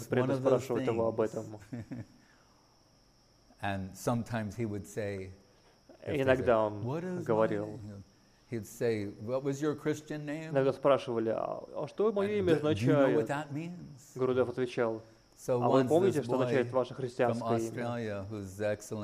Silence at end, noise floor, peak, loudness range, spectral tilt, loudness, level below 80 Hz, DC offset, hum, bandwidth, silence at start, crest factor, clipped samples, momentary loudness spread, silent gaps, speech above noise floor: 0 s; -65 dBFS; -12 dBFS; 8 LU; -6.5 dB/octave; -32 LUFS; -66 dBFS; under 0.1%; none; 15.5 kHz; 0 s; 20 dB; under 0.1%; 15 LU; none; 33 dB